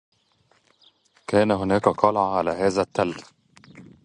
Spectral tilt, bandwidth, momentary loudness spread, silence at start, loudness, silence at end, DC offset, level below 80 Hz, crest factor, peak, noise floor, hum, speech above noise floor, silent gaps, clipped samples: -6 dB/octave; 10.5 kHz; 8 LU; 1.3 s; -22 LUFS; 0.25 s; under 0.1%; -54 dBFS; 24 dB; -2 dBFS; -64 dBFS; none; 42 dB; none; under 0.1%